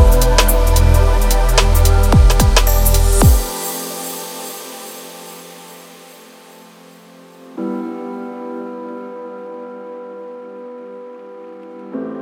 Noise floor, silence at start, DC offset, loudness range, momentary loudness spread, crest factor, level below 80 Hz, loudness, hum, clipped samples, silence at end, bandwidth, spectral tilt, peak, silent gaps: -42 dBFS; 0 s; under 0.1%; 18 LU; 22 LU; 16 dB; -18 dBFS; -15 LUFS; none; under 0.1%; 0 s; 17 kHz; -4.5 dB/octave; 0 dBFS; none